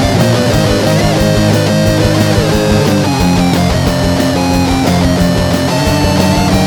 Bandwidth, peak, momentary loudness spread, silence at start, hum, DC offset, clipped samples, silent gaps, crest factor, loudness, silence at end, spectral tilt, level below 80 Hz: over 20 kHz; 0 dBFS; 2 LU; 0 s; none; under 0.1%; under 0.1%; none; 10 dB; -11 LUFS; 0 s; -5.5 dB/octave; -24 dBFS